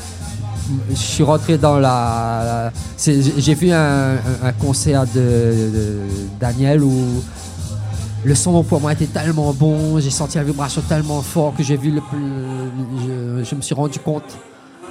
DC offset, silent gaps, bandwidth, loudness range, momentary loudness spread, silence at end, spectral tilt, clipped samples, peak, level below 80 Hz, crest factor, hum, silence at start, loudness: under 0.1%; none; 15 kHz; 5 LU; 11 LU; 0 s; -6 dB/octave; under 0.1%; 0 dBFS; -36 dBFS; 16 dB; none; 0 s; -17 LUFS